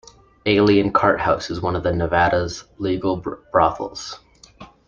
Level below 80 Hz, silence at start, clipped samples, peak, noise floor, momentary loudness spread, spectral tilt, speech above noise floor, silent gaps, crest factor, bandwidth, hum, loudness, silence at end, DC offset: -44 dBFS; 0.45 s; under 0.1%; -2 dBFS; -45 dBFS; 14 LU; -6 dB/octave; 26 dB; none; 18 dB; 7.6 kHz; none; -20 LUFS; 0.25 s; under 0.1%